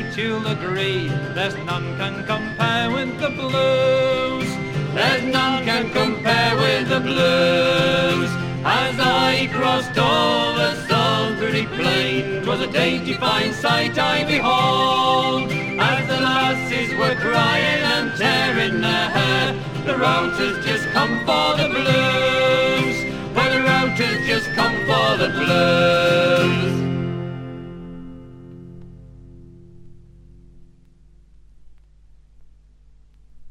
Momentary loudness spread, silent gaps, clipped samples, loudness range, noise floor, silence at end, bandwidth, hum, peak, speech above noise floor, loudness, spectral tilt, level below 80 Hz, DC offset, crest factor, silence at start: 7 LU; none; under 0.1%; 3 LU; -49 dBFS; 0 s; 16 kHz; 50 Hz at -50 dBFS; -4 dBFS; 30 dB; -19 LUFS; -5 dB/octave; -48 dBFS; under 0.1%; 16 dB; 0 s